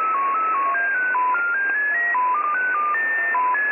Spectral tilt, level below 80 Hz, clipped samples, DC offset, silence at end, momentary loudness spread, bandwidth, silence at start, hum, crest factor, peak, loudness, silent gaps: 9.5 dB/octave; -88 dBFS; under 0.1%; under 0.1%; 0 s; 1 LU; 3.4 kHz; 0 s; none; 10 dB; -12 dBFS; -20 LUFS; none